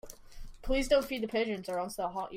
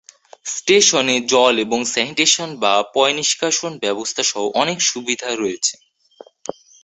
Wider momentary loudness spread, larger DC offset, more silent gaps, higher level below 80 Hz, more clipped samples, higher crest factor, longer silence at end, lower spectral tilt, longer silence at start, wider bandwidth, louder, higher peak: first, 21 LU vs 10 LU; neither; neither; first, -44 dBFS vs -64 dBFS; neither; about the same, 18 dB vs 18 dB; second, 0 s vs 1.1 s; first, -4 dB/octave vs -1 dB/octave; second, 0.05 s vs 0.45 s; first, 16 kHz vs 8.4 kHz; second, -32 LUFS vs -17 LUFS; second, -14 dBFS vs -2 dBFS